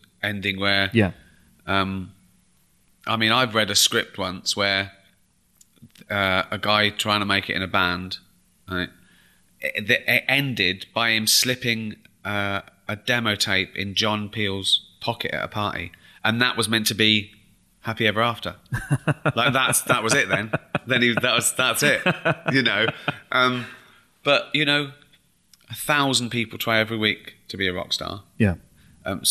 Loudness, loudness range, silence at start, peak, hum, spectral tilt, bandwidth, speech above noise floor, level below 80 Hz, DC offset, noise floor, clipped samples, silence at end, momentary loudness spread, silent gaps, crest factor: -21 LUFS; 3 LU; 0.2 s; -4 dBFS; none; -3 dB/octave; 15.5 kHz; 40 dB; -56 dBFS; under 0.1%; -63 dBFS; under 0.1%; 0 s; 13 LU; none; 20 dB